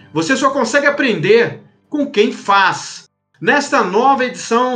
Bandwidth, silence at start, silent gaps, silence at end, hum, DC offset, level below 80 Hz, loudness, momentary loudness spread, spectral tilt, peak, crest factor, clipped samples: 9.6 kHz; 0.15 s; none; 0 s; none; under 0.1%; -70 dBFS; -14 LUFS; 9 LU; -4 dB/octave; 0 dBFS; 14 dB; under 0.1%